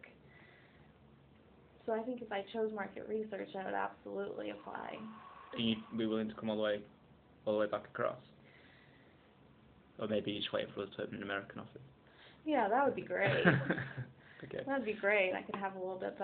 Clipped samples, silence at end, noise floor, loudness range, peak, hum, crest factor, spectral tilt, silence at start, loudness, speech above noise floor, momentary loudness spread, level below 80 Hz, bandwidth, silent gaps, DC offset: under 0.1%; 0 s; -64 dBFS; 7 LU; -10 dBFS; none; 28 dB; -4 dB/octave; 0.05 s; -38 LUFS; 26 dB; 16 LU; -72 dBFS; 4.6 kHz; none; under 0.1%